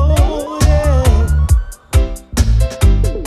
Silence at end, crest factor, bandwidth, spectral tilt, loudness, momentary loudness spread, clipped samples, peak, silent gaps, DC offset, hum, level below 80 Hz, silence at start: 0 s; 10 dB; 14 kHz; -6 dB/octave; -15 LUFS; 5 LU; under 0.1%; -2 dBFS; none; under 0.1%; none; -14 dBFS; 0 s